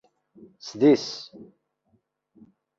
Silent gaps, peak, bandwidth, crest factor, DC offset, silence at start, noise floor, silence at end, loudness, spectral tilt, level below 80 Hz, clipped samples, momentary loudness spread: none; -8 dBFS; 7.4 kHz; 20 dB; under 0.1%; 0.65 s; -70 dBFS; 1.35 s; -22 LUFS; -5.5 dB/octave; -72 dBFS; under 0.1%; 22 LU